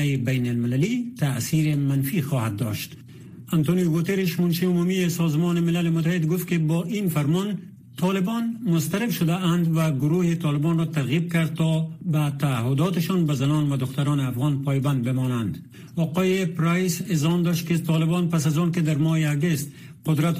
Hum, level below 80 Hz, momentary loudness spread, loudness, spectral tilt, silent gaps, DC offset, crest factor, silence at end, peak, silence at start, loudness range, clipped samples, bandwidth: none; -58 dBFS; 5 LU; -23 LUFS; -6.5 dB/octave; none; under 0.1%; 12 dB; 0 s; -10 dBFS; 0 s; 2 LU; under 0.1%; 15.5 kHz